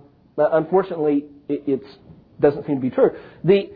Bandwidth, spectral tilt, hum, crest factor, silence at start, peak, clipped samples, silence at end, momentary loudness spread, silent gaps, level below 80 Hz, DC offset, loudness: 5 kHz; -11 dB/octave; none; 18 dB; 0.35 s; -4 dBFS; under 0.1%; 0 s; 8 LU; none; -58 dBFS; under 0.1%; -21 LUFS